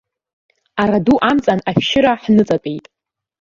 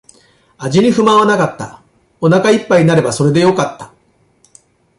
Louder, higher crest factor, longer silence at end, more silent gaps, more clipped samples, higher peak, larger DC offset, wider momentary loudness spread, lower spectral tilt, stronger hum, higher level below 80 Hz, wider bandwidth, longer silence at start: second, -15 LUFS vs -12 LUFS; about the same, 16 dB vs 12 dB; second, 0.6 s vs 1.15 s; neither; neither; about the same, -2 dBFS vs 0 dBFS; neither; about the same, 12 LU vs 11 LU; about the same, -6.5 dB/octave vs -6 dB/octave; neither; about the same, -48 dBFS vs -52 dBFS; second, 7.4 kHz vs 11.5 kHz; first, 0.75 s vs 0.6 s